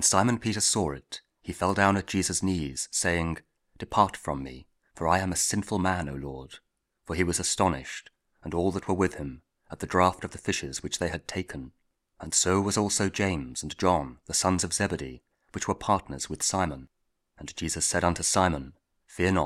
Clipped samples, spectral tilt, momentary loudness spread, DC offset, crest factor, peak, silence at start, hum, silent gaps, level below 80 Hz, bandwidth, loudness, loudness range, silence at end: under 0.1%; -3.5 dB/octave; 16 LU; under 0.1%; 24 dB; -6 dBFS; 0 s; none; none; -50 dBFS; 16 kHz; -27 LUFS; 3 LU; 0 s